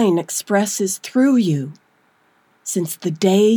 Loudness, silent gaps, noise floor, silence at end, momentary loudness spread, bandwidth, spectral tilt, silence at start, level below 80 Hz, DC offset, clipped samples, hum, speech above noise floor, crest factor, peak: -19 LUFS; none; -59 dBFS; 0 s; 9 LU; over 20 kHz; -5 dB/octave; 0 s; -80 dBFS; under 0.1%; under 0.1%; none; 42 dB; 14 dB; -4 dBFS